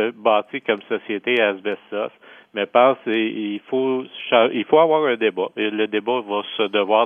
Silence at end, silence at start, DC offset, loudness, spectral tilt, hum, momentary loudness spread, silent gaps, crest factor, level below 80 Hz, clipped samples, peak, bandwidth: 0 s; 0 s; under 0.1%; -20 LUFS; -7 dB/octave; none; 11 LU; none; 18 dB; -78 dBFS; under 0.1%; -2 dBFS; 3.7 kHz